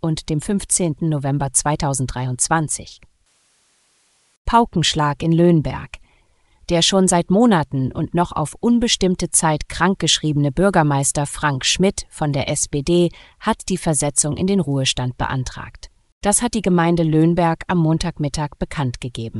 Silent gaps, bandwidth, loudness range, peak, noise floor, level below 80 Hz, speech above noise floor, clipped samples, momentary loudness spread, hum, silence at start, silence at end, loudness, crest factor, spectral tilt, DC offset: 4.37-4.45 s, 16.12-16.21 s; 13.5 kHz; 4 LU; 0 dBFS; -61 dBFS; -38 dBFS; 43 dB; under 0.1%; 9 LU; none; 0.05 s; 0 s; -18 LUFS; 18 dB; -4.5 dB/octave; under 0.1%